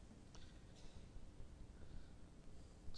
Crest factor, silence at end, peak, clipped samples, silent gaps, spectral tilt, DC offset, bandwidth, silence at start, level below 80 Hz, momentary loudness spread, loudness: 16 dB; 0 s; -38 dBFS; under 0.1%; none; -5.5 dB/octave; under 0.1%; 10 kHz; 0 s; -60 dBFS; 2 LU; -62 LUFS